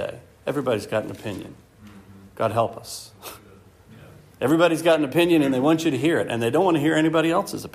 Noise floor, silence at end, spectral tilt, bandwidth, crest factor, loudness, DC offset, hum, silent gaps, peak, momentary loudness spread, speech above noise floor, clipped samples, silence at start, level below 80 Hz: -50 dBFS; 0.05 s; -5.5 dB/octave; 15.5 kHz; 16 dB; -21 LUFS; under 0.1%; none; none; -6 dBFS; 17 LU; 28 dB; under 0.1%; 0 s; -60 dBFS